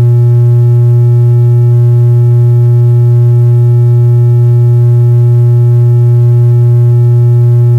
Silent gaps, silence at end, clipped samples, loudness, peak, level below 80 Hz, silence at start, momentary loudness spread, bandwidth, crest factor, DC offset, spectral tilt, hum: none; 0 s; under 0.1%; -6 LUFS; -2 dBFS; -42 dBFS; 0 s; 0 LU; 1.9 kHz; 2 dB; under 0.1%; -11 dB/octave; none